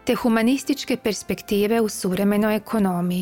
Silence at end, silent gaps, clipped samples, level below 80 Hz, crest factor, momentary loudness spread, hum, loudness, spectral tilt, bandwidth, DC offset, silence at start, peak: 0 s; none; under 0.1%; -52 dBFS; 14 dB; 5 LU; none; -22 LUFS; -5.5 dB/octave; 17 kHz; under 0.1%; 0.05 s; -6 dBFS